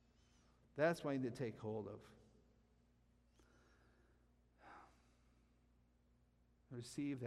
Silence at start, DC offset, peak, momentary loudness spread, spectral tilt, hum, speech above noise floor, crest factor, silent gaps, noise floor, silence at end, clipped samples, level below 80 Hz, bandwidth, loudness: 0.75 s; under 0.1%; -26 dBFS; 23 LU; -6.5 dB/octave; 60 Hz at -80 dBFS; 32 dB; 22 dB; none; -75 dBFS; 0 s; under 0.1%; -76 dBFS; 13.5 kHz; -44 LUFS